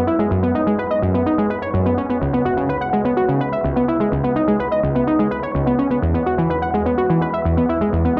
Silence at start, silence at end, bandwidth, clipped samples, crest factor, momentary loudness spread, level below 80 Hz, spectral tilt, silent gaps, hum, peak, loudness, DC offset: 0 s; 0 s; 5.2 kHz; under 0.1%; 12 dB; 2 LU; -34 dBFS; -11 dB/octave; none; none; -6 dBFS; -19 LUFS; under 0.1%